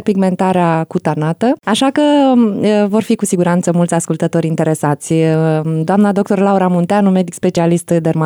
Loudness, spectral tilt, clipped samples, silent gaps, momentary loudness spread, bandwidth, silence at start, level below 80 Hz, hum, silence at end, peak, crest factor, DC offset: -13 LUFS; -6.5 dB/octave; under 0.1%; none; 4 LU; 19 kHz; 0 s; -58 dBFS; none; 0 s; -2 dBFS; 10 dB; under 0.1%